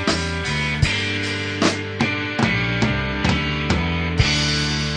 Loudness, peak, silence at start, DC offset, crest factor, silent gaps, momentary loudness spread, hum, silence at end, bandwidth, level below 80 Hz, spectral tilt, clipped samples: -20 LUFS; -2 dBFS; 0 s; under 0.1%; 18 dB; none; 4 LU; none; 0 s; 10 kHz; -32 dBFS; -4.5 dB/octave; under 0.1%